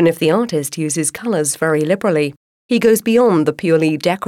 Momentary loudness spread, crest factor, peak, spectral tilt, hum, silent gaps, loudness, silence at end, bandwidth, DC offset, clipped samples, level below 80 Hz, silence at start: 7 LU; 12 dB; -4 dBFS; -5 dB/octave; none; 2.37-2.69 s; -16 LUFS; 0 s; 16.5 kHz; under 0.1%; under 0.1%; -60 dBFS; 0 s